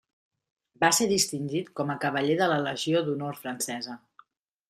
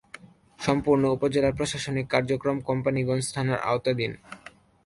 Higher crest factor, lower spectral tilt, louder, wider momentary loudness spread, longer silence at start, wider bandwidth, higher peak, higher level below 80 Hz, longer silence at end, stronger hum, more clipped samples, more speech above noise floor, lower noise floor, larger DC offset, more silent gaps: about the same, 20 dB vs 18 dB; second, -3.5 dB/octave vs -5.5 dB/octave; about the same, -27 LUFS vs -26 LUFS; about the same, 11 LU vs 9 LU; first, 0.8 s vs 0.25 s; first, 15.5 kHz vs 11.5 kHz; about the same, -8 dBFS vs -8 dBFS; second, -68 dBFS vs -52 dBFS; first, 0.7 s vs 0.35 s; neither; neither; first, 33 dB vs 24 dB; first, -60 dBFS vs -49 dBFS; neither; neither